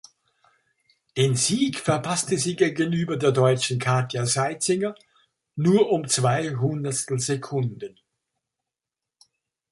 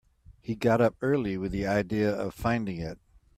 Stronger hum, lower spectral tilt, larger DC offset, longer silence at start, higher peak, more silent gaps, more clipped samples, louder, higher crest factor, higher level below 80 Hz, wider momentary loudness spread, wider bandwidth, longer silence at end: neither; second, -4.5 dB/octave vs -7.5 dB/octave; neither; first, 1.15 s vs 0.3 s; first, -6 dBFS vs -12 dBFS; neither; neither; first, -23 LUFS vs -28 LUFS; about the same, 18 dB vs 18 dB; second, -64 dBFS vs -50 dBFS; second, 8 LU vs 13 LU; second, 11.5 kHz vs 15 kHz; first, 1.85 s vs 0.45 s